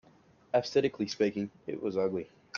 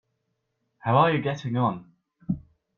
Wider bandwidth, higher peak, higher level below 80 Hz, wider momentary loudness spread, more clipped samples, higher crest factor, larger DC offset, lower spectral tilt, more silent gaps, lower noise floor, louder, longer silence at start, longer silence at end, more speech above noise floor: about the same, 7.2 kHz vs 7 kHz; second, -14 dBFS vs -8 dBFS; second, -72 dBFS vs -58 dBFS; second, 9 LU vs 15 LU; neither; about the same, 18 dB vs 20 dB; neither; second, -5.5 dB/octave vs -8 dB/octave; neither; second, -62 dBFS vs -77 dBFS; second, -32 LUFS vs -25 LUFS; second, 0.55 s vs 0.85 s; second, 0 s vs 0.4 s; second, 31 dB vs 54 dB